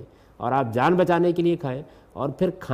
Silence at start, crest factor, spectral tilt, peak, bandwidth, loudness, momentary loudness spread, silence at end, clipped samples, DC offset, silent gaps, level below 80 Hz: 0 s; 16 dB; -8 dB/octave; -8 dBFS; 13 kHz; -23 LUFS; 12 LU; 0 s; under 0.1%; under 0.1%; none; -56 dBFS